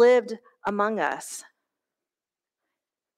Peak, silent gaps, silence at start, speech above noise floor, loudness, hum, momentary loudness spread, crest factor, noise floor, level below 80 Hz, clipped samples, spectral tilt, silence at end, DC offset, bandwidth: -10 dBFS; none; 0 s; over 66 dB; -26 LUFS; none; 16 LU; 18 dB; under -90 dBFS; -72 dBFS; under 0.1%; -4 dB/octave; 1.75 s; under 0.1%; 15 kHz